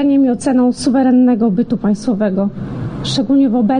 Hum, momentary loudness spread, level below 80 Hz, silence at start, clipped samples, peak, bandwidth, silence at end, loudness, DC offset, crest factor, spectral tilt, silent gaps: none; 9 LU; -44 dBFS; 0 s; under 0.1%; -4 dBFS; 10 kHz; 0 s; -14 LUFS; under 0.1%; 10 dB; -6.5 dB/octave; none